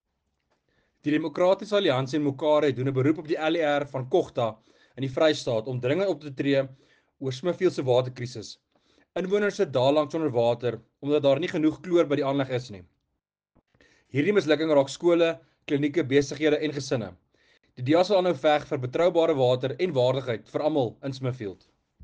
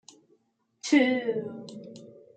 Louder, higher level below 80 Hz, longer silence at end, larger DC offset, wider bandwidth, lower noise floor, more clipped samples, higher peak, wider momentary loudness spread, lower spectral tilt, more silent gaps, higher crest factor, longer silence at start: about the same, -25 LUFS vs -25 LUFS; first, -66 dBFS vs -82 dBFS; second, 0 s vs 0.3 s; neither; about the same, 9.4 kHz vs 9.2 kHz; first, -82 dBFS vs -71 dBFS; neither; about the same, -8 dBFS vs -8 dBFS; second, 11 LU vs 23 LU; first, -6.5 dB/octave vs -4 dB/octave; neither; about the same, 18 dB vs 20 dB; first, 1.05 s vs 0.85 s